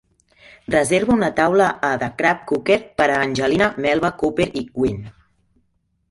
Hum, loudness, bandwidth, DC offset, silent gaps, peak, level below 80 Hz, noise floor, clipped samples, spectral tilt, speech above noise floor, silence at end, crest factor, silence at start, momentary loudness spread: none; -19 LUFS; 11.5 kHz; under 0.1%; none; -2 dBFS; -48 dBFS; -67 dBFS; under 0.1%; -5 dB/octave; 49 dB; 1 s; 18 dB; 0.7 s; 6 LU